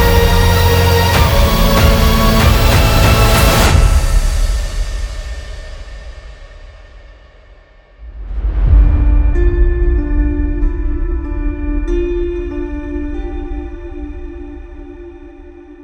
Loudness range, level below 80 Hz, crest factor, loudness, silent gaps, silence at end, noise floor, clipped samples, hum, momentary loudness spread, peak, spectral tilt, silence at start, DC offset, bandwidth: 16 LU; -16 dBFS; 12 dB; -14 LUFS; none; 0 s; -42 dBFS; under 0.1%; none; 21 LU; 0 dBFS; -5 dB/octave; 0 s; under 0.1%; 19.5 kHz